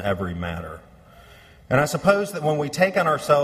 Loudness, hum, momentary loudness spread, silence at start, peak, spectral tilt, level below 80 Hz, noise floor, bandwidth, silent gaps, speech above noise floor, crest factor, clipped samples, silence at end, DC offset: -22 LUFS; none; 13 LU; 0 s; -2 dBFS; -5.5 dB/octave; -48 dBFS; -48 dBFS; 15.5 kHz; none; 27 dB; 20 dB; under 0.1%; 0 s; under 0.1%